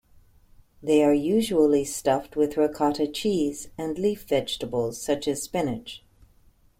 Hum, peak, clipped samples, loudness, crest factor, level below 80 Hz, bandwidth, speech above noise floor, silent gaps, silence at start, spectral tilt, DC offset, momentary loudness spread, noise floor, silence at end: none; -8 dBFS; under 0.1%; -25 LUFS; 16 dB; -54 dBFS; 16.5 kHz; 34 dB; none; 0.8 s; -5 dB/octave; under 0.1%; 11 LU; -58 dBFS; 0.8 s